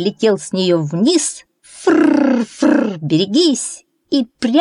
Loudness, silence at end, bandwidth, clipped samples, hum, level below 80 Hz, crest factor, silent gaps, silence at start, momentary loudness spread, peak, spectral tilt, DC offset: -15 LUFS; 0 s; 11 kHz; under 0.1%; none; -64 dBFS; 12 dB; none; 0 s; 8 LU; -2 dBFS; -4.5 dB/octave; under 0.1%